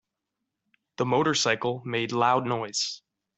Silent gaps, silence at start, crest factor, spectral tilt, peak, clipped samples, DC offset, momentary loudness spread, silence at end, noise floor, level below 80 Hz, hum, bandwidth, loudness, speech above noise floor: none; 1 s; 20 dB; -3.5 dB/octave; -8 dBFS; under 0.1%; under 0.1%; 8 LU; 0.4 s; -84 dBFS; -70 dBFS; none; 8.2 kHz; -26 LUFS; 58 dB